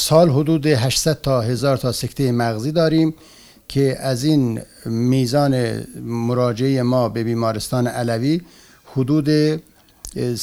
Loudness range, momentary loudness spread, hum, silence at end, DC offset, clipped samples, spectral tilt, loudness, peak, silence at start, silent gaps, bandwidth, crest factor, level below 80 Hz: 2 LU; 9 LU; none; 0 s; under 0.1%; under 0.1%; -6 dB/octave; -19 LUFS; 0 dBFS; 0 s; none; 16 kHz; 18 dB; -46 dBFS